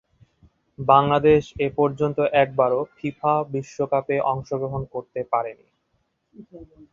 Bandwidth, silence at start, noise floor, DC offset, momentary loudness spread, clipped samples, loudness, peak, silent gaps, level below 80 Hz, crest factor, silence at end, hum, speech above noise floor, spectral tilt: 7.4 kHz; 0.8 s; -71 dBFS; under 0.1%; 12 LU; under 0.1%; -22 LUFS; -2 dBFS; none; -52 dBFS; 20 dB; 0.25 s; none; 49 dB; -7.5 dB/octave